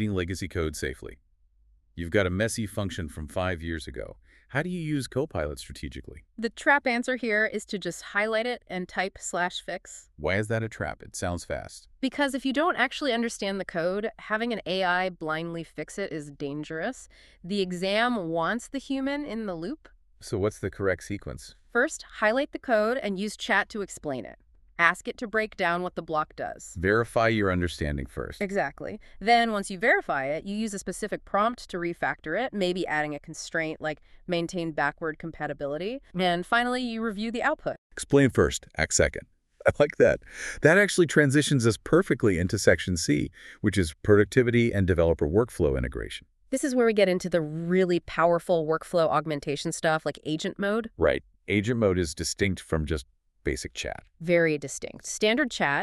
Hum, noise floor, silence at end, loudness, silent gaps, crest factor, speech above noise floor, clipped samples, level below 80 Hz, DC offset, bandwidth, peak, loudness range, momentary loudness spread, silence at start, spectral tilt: none; -62 dBFS; 0 s; -27 LUFS; 37.78-37.90 s; 24 dB; 35 dB; under 0.1%; -46 dBFS; under 0.1%; 13.5 kHz; -4 dBFS; 7 LU; 13 LU; 0 s; -5 dB/octave